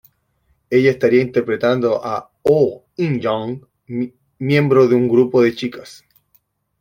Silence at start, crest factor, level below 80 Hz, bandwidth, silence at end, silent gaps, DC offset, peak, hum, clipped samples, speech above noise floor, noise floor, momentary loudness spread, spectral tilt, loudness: 0.7 s; 16 dB; -58 dBFS; 16 kHz; 0.85 s; none; under 0.1%; -2 dBFS; none; under 0.1%; 47 dB; -63 dBFS; 14 LU; -7.5 dB/octave; -17 LUFS